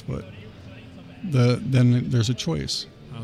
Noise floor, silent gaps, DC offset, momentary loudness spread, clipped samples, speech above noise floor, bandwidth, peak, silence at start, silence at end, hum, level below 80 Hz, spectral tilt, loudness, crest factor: -42 dBFS; none; under 0.1%; 23 LU; under 0.1%; 20 dB; 11.5 kHz; -8 dBFS; 0.05 s; 0 s; none; -50 dBFS; -6 dB/octave; -22 LUFS; 16 dB